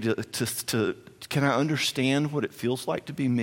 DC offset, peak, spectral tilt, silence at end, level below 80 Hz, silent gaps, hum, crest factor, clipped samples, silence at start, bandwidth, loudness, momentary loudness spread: under 0.1%; -8 dBFS; -5 dB/octave; 0 s; -66 dBFS; none; none; 18 dB; under 0.1%; 0 s; 17 kHz; -27 LUFS; 7 LU